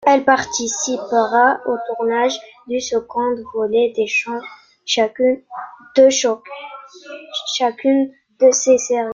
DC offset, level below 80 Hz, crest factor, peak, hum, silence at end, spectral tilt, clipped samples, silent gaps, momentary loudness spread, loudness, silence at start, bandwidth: under 0.1%; -62 dBFS; 16 dB; -2 dBFS; none; 0 s; -1.5 dB/octave; under 0.1%; none; 19 LU; -17 LUFS; 0 s; 7.6 kHz